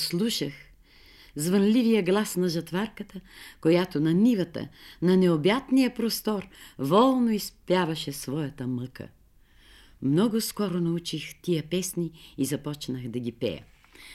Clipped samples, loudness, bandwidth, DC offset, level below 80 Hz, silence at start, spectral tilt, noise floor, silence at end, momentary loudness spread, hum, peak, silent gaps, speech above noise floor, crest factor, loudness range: under 0.1%; -26 LUFS; 16 kHz; under 0.1%; -58 dBFS; 0 s; -5.5 dB/octave; -57 dBFS; 0 s; 14 LU; none; -10 dBFS; none; 31 dB; 16 dB; 5 LU